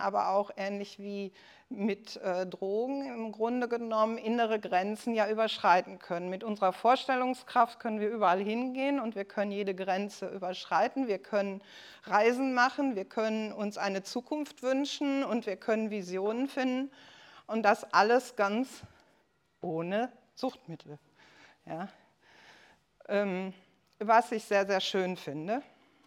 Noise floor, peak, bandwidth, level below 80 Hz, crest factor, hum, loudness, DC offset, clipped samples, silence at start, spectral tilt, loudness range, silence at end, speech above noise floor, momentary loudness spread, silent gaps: -71 dBFS; -10 dBFS; 16 kHz; -82 dBFS; 22 dB; none; -31 LUFS; under 0.1%; under 0.1%; 0 s; -5 dB/octave; 10 LU; 0.45 s; 40 dB; 13 LU; none